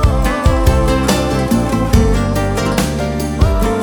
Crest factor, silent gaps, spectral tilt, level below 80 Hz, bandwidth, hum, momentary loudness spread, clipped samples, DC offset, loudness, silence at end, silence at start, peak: 12 dB; none; -6 dB/octave; -18 dBFS; over 20 kHz; none; 3 LU; under 0.1%; under 0.1%; -15 LUFS; 0 s; 0 s; 0 dBFS